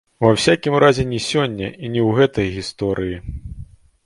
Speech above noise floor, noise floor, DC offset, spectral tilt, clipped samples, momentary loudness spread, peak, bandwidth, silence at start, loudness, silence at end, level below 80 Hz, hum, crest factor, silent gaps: 21 dB; -39 dBFS; under 0.1%; -5.5 dB/octave; under 0.1%; 17 LU; 0 dBFS; 11.5 kHz; 0.2 s; -18 LUFS; 0.4 s; -40 dBFS; none; 18 dB; none